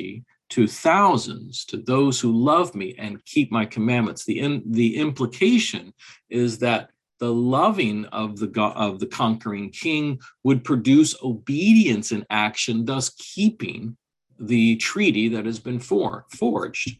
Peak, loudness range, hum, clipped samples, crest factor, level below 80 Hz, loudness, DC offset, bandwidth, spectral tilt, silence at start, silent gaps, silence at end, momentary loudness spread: -4 dBFS; 3 LU; none; under 0.1%; 16 dB; -62 dBFS; -22 LUFS; under 0.1%; 12 kHz; -5 dB/octave; 0 s; none; 0.05 s; 12 LU